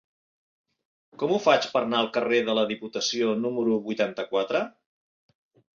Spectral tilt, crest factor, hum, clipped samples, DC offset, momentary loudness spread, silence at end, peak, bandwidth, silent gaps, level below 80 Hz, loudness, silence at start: -4 dB/octave; 20 dB; none; under 0.1%; under 0.1%; 7 LU; 1.1 s; -8 dBFS; 7.4 kHz; none; -74 dBFS; -25 LUFS; 1.2 s